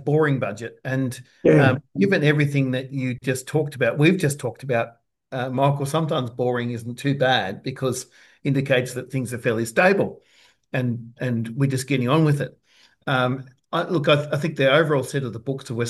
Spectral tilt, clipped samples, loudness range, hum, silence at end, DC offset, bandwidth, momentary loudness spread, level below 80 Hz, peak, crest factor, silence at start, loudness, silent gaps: -6 dB/octave; under 0.1%; 3 LU; none; 0 s; under 0.1%; 12.5 kHz; 11 LU; -64 dBFS; -2 dBFS; 20 dB; 0 s; -22 LUFS; none